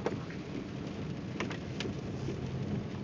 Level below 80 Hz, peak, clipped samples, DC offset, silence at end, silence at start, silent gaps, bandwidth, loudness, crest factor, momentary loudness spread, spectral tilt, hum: -54 dBFS; -20 dBFS; under 0.1%; under 0.1%; 0 s; 0 s; none; 7.8 kHz; -39 LUFS; 18 dB; 3 LU; -6.5 dB/octave; none